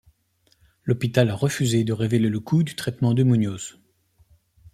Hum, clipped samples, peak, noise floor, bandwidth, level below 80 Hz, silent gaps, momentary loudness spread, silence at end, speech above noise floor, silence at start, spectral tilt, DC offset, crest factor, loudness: none; under 0.1%; -4 dBFS; -65 dBFS; 15 kHz; -58 dBFS; none; 8 LU; 1.05 s; 44 dB; 0.85 s; -6.5 dB/octave; under 0.1%; 20 dB; -22 LUFS